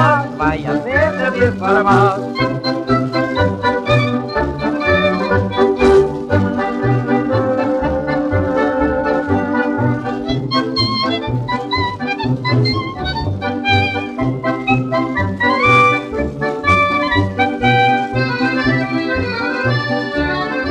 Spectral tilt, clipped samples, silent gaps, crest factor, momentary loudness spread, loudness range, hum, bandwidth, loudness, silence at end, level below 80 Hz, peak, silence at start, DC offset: -7 dB/octave; under 0.1%; none; 14 dB; 7 LU; 3 LU; none; 10 kHz; -16 LUFS; 0 s; -36 dBFS; 0 dBFS; 0 s; under 0.1%